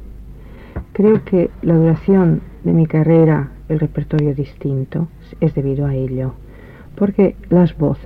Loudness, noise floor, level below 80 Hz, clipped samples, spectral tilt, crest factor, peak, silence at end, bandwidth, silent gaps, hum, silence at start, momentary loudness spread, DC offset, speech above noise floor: -16 LUFS; -37 dBFS; -36 dBFS; under 0.1%; -11.5 dB/octave; 14 dB; -2 dBFS; 0 s; 4.3 kHz; none; none; 0 s; 10 LU; under 0.1%; 22 dB